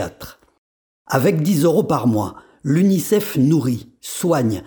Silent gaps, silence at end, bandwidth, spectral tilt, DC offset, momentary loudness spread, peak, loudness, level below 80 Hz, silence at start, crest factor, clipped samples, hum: 0.58-1.05 s; 0 s; over 20 kHz; -6.5 dB/octave; under 0.1%; 13 LU; 0 dBFS; -18 LUFS; -56 dBFS; 0 s; 18 dB; under 0.1%; none